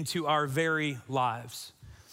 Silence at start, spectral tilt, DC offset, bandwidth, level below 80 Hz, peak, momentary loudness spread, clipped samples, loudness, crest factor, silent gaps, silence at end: 0 s; -4.5 dB/octave; under 0.1%; 16 kHz; -66 dBFS; -14 dBFS; 14 LU; under 0.1%; -30 LUFS; 18 dB; none; 0 s